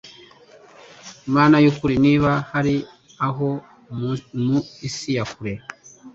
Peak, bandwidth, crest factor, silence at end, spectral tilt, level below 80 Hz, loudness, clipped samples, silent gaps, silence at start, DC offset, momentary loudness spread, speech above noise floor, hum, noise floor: -2 dBFS; 7.8 kHz; 18 dB; 0.05 s; -6.5 dB/octave; -50 dBFS; -20 LUFS; under 0.1%; none; 0.05 s; under 0.1%; 20 LU; 29 dB; none; -48 dBFS